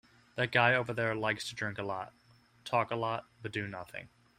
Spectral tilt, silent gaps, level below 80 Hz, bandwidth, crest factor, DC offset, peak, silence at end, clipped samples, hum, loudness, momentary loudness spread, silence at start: -5 dB/octave; none; -70 dBFS; 16 kHz; 24 dB; under 0.1%; -10 dBFS; 0.3 s; under 0.1%; none; -33 LUFS; 18 LU; 0.35 s